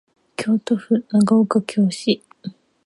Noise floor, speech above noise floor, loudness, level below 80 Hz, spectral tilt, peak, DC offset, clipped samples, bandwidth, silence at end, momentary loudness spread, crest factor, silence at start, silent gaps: -37 dBFS; 19 dB; -19 LUFS; -66 dBFS; -6 dB/octave; -4 dBFS; under 0.1%; under 0.1%; 11.5 kHz; 0.4 s; 20 LU; 16 dB; 0.4 s; none